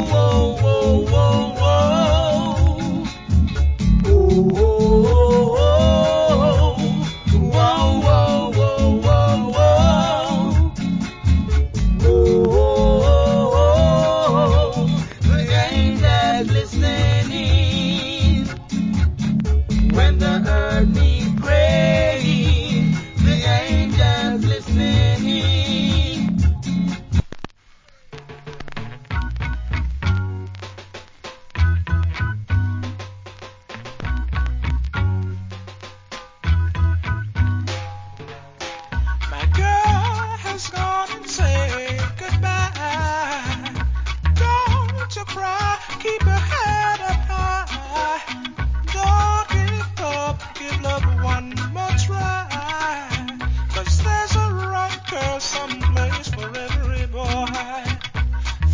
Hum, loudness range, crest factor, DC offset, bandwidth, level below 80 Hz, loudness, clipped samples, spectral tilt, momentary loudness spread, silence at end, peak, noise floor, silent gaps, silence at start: none; 9 LU; 16 dB; under 0.1%; 7.6 kHz; -22 dBFS; -19 LUFS; under 0.1%; -6 dB/octave; 12 LU; 0 s; -2 dBFS; -50 dBFS; none; 0 s